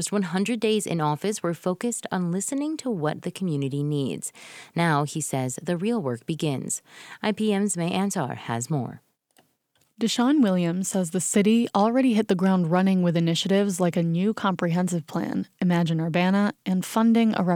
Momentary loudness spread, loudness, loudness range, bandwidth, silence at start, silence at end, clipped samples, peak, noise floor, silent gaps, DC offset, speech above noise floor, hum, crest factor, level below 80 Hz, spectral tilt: 8 LU; -24 LUFS; 6 LU; 16 kHz; 0 s; 0 s; under 0.1%; -8 dBFS; -69 dBFS; none; under 0.1%; 45 dB; none; 16 dB; -70 dBFS; -5.5 dB/octave